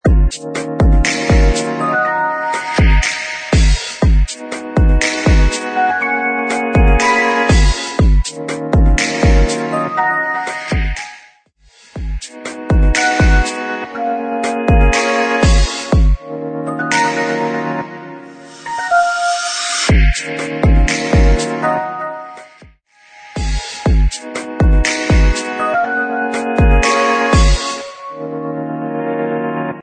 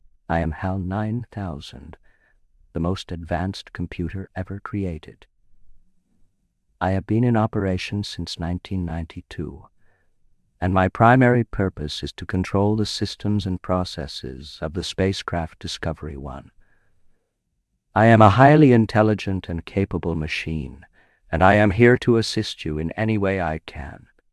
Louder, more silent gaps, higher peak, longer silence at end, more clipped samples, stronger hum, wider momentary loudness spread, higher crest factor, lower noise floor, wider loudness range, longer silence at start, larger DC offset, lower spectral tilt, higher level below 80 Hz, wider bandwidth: first, -15 LUFS vs -21 LUFS; neither; about the same, -2 dBFS vs 0 dBFS; second, 0 s vs 0.35 s; neither; neither; second, 12 LU vs 17 LU; second, 12 dB vs 22 dB; second, -50 dBFS vs -74 dBFS; second, 4 LU vs 12 LU; second, 0.05 s vs 0.3 s; neither; second, -5 dB/octave vs -7 dB/octave; first, -16 dBFS vs -44 dBFS; second, 9.4 kHz vs 12 kHz